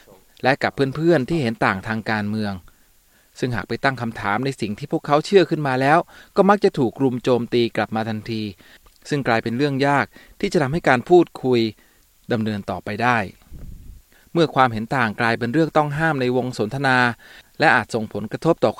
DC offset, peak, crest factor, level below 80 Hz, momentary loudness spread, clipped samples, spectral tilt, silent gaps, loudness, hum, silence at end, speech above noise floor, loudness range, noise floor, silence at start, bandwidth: under 0.1%; 0 dBFS; 20 dB; -50 dBFS; 10 LU; under 0.1%; -6.5 dB/octave; none; -20 LUFS; none; 0.05 s; 36 dB; 5 LU; -56 dBFS; 0.45 s; 16 kHz